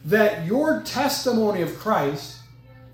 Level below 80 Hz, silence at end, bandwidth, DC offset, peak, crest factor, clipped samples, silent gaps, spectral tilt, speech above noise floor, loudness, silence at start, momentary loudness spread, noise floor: -56 dBFS; 0.05 s; 18 kHz; under 0.1%; -4 dBFS; 20 dB; under 0.1%; none; -5 dB/octave; 25 dB; -22 LUFS; 0 s; 7 LU; -47 dBFS